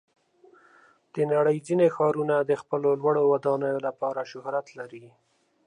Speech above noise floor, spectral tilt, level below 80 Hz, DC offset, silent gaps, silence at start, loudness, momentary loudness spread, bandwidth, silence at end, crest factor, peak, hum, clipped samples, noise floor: 33 dB; -7.5 dB/octave; -78 dBFS; under 0.1%; none; 1.15 s; -25 LUFS; 11 LU; 10.5 kHz; 0.6 s; 16 dB; -10 dBFS; none; under 0.1%; -58 dBFS